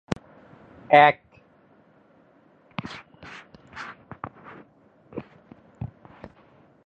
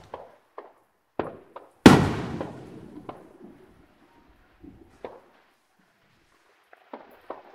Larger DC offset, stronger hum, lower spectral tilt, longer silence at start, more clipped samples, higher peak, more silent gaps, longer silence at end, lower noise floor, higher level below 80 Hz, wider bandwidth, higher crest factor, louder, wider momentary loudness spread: neither; neither; about the same, -6 dB/octave vs -6 dB/octave; first, 0.9 s vs 0.15 s; neither; about the same, -2 dBFS vs 0 dBFS; neither; first, 1 s vs 0.2 s; second, -58 dBFS vs -66 dBFS; second, -58 dBFS vs -48 dBFS; second, 8.2 kHz vs 16 kHz; about the same, 26 dB vs 28 dB; about the same, -21 LUFS vs -21 LUFS; about the same, 30 LU vs 31 LU